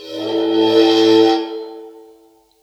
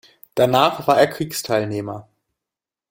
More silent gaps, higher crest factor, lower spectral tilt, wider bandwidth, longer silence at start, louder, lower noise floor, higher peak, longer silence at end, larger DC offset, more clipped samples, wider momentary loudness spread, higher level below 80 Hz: neither; second, 14 dB vs 20 dB; about the same, -4.5 dB/octave vs -4.5 dB/octave; second, 12.5 kHz vs 17 kHz; second, 0 s vs 0.35 s; first, -14 LUFS vs -19 LUFS; second, -51 dBFS vs -87 dBFS; about the same, -2 dBFS vs 0 dBFS; second, 0.7 s vs 0.9 s; neither; neither; first, 17 LU vs 13 LU; second, -74 dBFS vs -58 dBFS